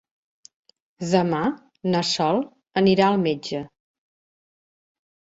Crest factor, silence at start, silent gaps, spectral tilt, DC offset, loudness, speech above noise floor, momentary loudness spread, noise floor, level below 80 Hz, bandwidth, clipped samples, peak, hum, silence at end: 22 dB; 1 s; none; -5.5 dB/octave; under 0.1%; -22 LUFS; over 69 dB; 13 LU; under -90 dBFS; -62 dBFS; 8 kHz; under 0.1%; -4 dBFS; none; 1.65 s